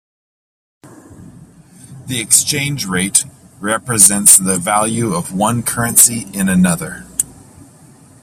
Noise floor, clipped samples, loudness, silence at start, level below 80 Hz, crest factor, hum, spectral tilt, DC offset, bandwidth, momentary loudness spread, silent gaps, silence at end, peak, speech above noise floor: -43 dBFS; 0.3%; -12 LUFS; 0.85 s; -48 dBFS; 16 dB; none; -3 dB/octave; under 0.1%; over 20 kHz; 15 LU; none; 0.9 s; 0 dBFS; 29 dB